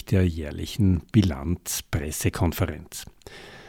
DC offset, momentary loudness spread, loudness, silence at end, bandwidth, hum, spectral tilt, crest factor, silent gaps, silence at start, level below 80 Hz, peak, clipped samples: under 0.1%; 16 LU; -25 LUFS; 0 s; 17.5 kHz; none; -5.5 dB/octave; 20 dB; none; 0.05 s; -40 dBFS; -6 dBFS; under 0.1%